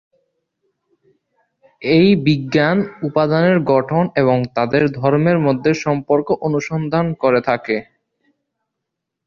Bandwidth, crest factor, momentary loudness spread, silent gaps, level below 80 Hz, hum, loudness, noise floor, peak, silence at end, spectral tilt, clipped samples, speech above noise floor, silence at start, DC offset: 7.2 kHz; 16 dB; 6 LU; none; -54 dBFS; none; -16 LUFS; -79 dBFS; 0 dBFS; 1.45 s; -7.5 dB/octave; under 0.1%; 63 dB; 1.8 s; under 0.1%